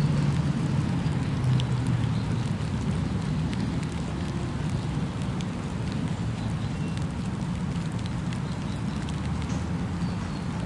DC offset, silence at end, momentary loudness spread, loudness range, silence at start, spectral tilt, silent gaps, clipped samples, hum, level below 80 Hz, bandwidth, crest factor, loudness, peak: under 0.1%; 0 s; 5 LU; 3 LU; 0 s; -7 dB/octave; none; under 0.1%; none; -40 dBFS; 11.5 kHz; 14 dB; -29 LUFS; -12 dBFS